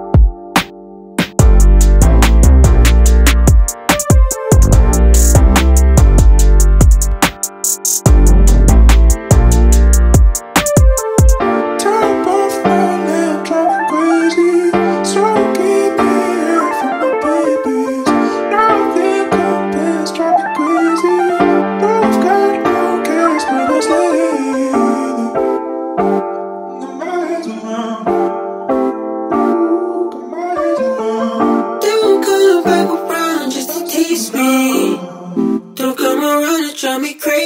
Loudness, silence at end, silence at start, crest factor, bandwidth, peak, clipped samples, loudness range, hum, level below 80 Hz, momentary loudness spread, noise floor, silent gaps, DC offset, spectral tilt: -13 LUFS; 0 s; 0 s; 10 dB; 16.5 kHz; 0 dBFS; under 0.1%; 6 LU; none; -14 dBFS; 8 LU; -33 dBFS; none; under 0.1%; -5.5 dB/octave